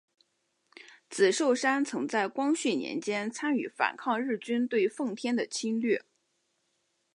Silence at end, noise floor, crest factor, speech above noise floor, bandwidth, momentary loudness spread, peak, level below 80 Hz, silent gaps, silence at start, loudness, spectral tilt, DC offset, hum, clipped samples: 1.15 s; -77 dBFS; 20 dB; 48 dB; 11 kHz; 6 LU; -10 dBFS; -86 dBFS; none; 0.8 s; -29 LUFS; -3.5 dB/octave; under 0.1%; none; under 0.1%